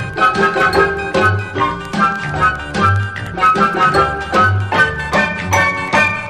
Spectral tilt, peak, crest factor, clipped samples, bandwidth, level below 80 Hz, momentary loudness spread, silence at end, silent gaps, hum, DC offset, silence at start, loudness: -5 dB/octave; 0 dBFS; 14 dB; under 0.1%; 13.5 kHz; -36 dBFS; 4 LU; 0 s; none; none; under 0.1%; 0 s; -14 LUFS